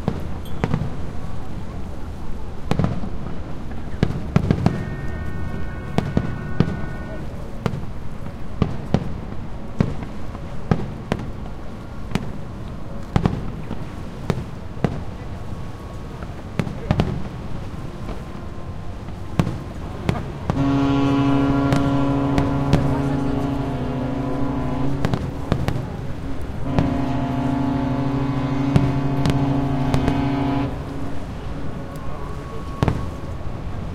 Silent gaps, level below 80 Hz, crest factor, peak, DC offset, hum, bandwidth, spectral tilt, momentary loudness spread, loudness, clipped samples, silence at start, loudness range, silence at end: none; -32 dBFS; 22 dB; 0 dBFS; under 0.1%; none; 13.5 kHz; -8 dB/octave; 14 LU; -25 LUFS; under 0.1%; 0 s; 8 LU; 0 s